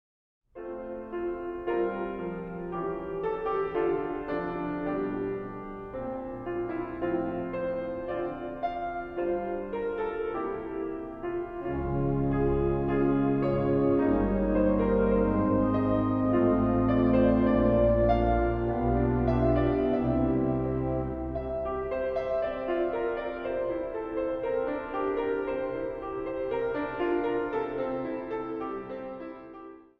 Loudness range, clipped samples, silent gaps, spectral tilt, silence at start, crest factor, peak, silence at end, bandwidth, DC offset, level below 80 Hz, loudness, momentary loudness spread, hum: 8 LU; under 0.1%; none; -10.5 dB/octave; 0.55 s; 18 dB; -10 dBFS; 0.2 s; 5.2 kHz; under 0.1%; -42 dBFS; -29 LUFS; 11 LU; none